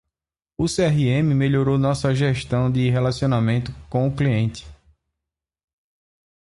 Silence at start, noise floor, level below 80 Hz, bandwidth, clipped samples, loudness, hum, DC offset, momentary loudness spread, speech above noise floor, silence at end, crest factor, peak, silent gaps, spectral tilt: 0.6 s; -88 dBFS; -44 dBFS; 11.5 kHz; under 0.1%; -21 LUFS; none; under 0.1%; 7 LU; 68 dB; 1.75 s; 14 dB; -6 dBFS; none; -7 dB/octave